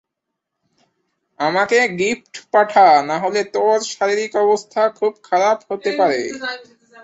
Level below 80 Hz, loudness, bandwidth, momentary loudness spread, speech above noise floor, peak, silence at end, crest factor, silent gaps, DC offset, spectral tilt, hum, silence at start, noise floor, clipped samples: -66 dBFS; -17 LUFS; 8.2 kHz; 11 LU; 62 dB; -2 dBFS; 0.4 s; 16 dB; none; under 0.1%; -3.5 dB/octave; none; 1.4 s; -79 dBFS; under 0.1%